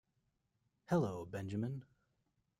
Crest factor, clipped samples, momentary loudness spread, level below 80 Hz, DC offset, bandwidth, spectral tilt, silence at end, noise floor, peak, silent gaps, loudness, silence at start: 20 dB; under 0.1%; 8 LU; -72 dBFS; under 0.1%; 13 kHz; -8 dB/octave; 0.75 s; -83 dBFS; -24 dBFS; none; -40 LUFS; 0.9 s